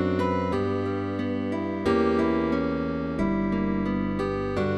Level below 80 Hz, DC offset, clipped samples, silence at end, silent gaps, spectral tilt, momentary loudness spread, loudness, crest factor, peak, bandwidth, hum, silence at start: -44 dBFS; 0.3%; under 0.1%; 0 s; none; -8 dB/octave; 5 LU; -26 LUFS; 14 dB; -12 dBFS; 11 kHz; none; 0 s